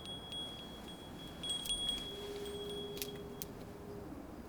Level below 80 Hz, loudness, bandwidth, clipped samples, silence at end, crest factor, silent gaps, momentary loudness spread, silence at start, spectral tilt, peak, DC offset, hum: -58 dBFS; -42 LUFS; over 20 kHz; under 0.1%; 0 s; 28 dB; none; 13 LU; 0 s; -3 dB/octave; -16 dBFS; under 0.1%; none